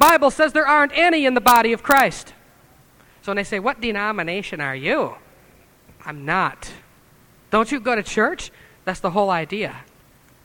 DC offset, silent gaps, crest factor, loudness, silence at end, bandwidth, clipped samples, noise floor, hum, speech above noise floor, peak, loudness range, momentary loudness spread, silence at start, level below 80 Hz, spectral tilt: under 0.1%; none; 20 dB; -19 LUFS; 0.6 s; over 20 kHz; under 0.1%; -53 dBFS; none; 33 dB; 0 dBFS; 8 LU; 17 LU; 0 s; -48 dBFS; -3.5 dB/octave